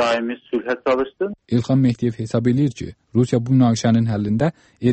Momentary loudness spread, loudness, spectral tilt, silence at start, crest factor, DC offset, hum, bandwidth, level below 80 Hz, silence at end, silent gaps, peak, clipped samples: 8 LU; -20 LUFS; -7 dB/octave; 0 s; 14 dB; under 0.1%; none; 8.6 kHz; -52 dBFS; 0 s; none; -4 dBFS; under 0.1%